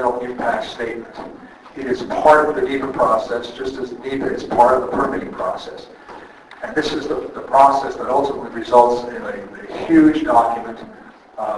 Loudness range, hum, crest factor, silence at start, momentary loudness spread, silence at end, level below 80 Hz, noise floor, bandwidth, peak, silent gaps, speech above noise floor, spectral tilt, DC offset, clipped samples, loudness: 4 LU; none; 18 dB; 0 s; 21 LU; 0 s; -48 dBFS; -39 dBFS; 11.5 kHz; 0 dBFS; none; 21 dB; -5.5 dB/octave; under 0.1%; under 0.1%; -18 LUFS